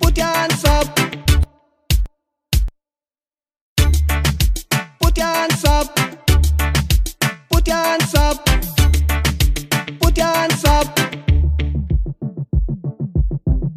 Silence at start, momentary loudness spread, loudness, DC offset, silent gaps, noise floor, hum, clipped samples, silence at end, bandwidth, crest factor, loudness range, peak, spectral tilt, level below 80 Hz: 0 s; 6 LU; -18 LUFS; under 0.1%; 3.61-3.76 s; under -90 dBFS; none; under 0.1%; 0 s; 16 kHz; 16 dB; 4 LU; 0 dBFS; -4.5 dB/octave; -20 dBFS